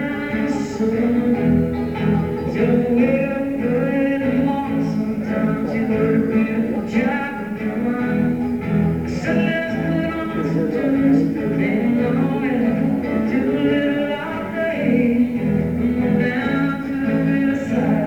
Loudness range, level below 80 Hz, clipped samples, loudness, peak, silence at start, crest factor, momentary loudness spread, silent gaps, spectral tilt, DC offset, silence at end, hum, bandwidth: 2 LU; -42 dBFS; under 0.1%; -19 LUFS; -6 dBFS; 0 s; 14 dB; 5 LU; none; -8 dB/octave; 0.2%; 0 s; none; 8.6 kHz